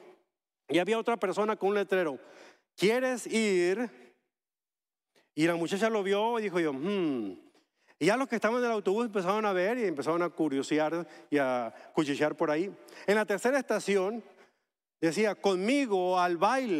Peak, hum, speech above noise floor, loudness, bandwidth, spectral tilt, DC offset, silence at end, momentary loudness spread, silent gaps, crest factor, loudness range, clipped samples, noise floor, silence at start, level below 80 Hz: -12 dBFS; none; over 61 dB; -29 LUFS; 14.5 kHz; -5 dB/octave; under 0.1%; 0 s; 6 LU; none; 18 dB; 2 LU; under 0.1%; under -90 dBFS; 0.05 s; -82 dBFS